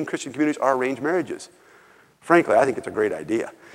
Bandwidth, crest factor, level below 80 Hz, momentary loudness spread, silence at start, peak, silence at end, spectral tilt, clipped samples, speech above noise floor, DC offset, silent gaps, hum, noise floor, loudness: 13 kHz; 22 dB; -66 dBFS; 12 LU; 0 s; -2 dBFS; 0.25 s; -5.5 dB/octave; under 0.1%; 31 dB; under 0.1%; none; none; -53 dBFS; -22 LUFS